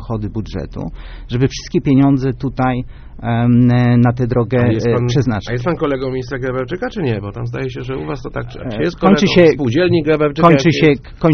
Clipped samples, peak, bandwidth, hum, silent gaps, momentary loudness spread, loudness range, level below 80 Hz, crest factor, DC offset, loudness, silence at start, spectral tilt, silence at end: under 0.1%; 0 dBFS; 6.6 kHz; none; none; 14 LU; 7 LU; -34 dBFS; 14 dB; under 0.1%; -15 LUFS; 0 s; -6.5 dB/octave; 0 s